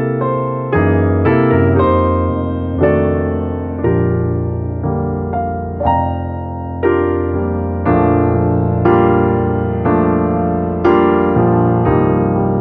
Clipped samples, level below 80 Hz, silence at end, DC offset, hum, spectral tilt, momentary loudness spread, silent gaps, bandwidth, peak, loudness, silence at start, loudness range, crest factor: under 0.1%; -36 dBFS; 0 s; under 0.1%; none; -12 dB/octave; 7 LU; none; 4 kHz; 0 dBFS; -15 LUFS; 0 s; 4 LU; 14 dB